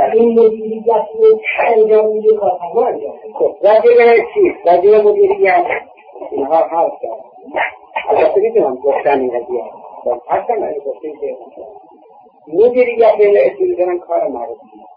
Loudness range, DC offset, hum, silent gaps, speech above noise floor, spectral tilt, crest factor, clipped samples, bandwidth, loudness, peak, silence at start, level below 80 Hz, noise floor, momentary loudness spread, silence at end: 7 LU; under 0.1%; none; none; 31 dB; -8.5 dB/octave; 12 dB; under 0.1%; 5 kHz; -13 LUFS; -2 dBFS; 0 s; -58 dBFS; -44 dBFS; 16 LU; 0.4 s